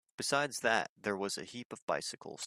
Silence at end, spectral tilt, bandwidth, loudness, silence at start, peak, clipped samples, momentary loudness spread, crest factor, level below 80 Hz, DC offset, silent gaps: 0 s; -2.5 dB/octave; 15.5 kHz; -35 LUFS; 0.2 s; -14 dBFS; under 0.1%; 10 LU; 22 dB; -78 dBFS; under 0.1%; 0.89-0.96 s, 1.65-1.70 s, 1.82-1.88 s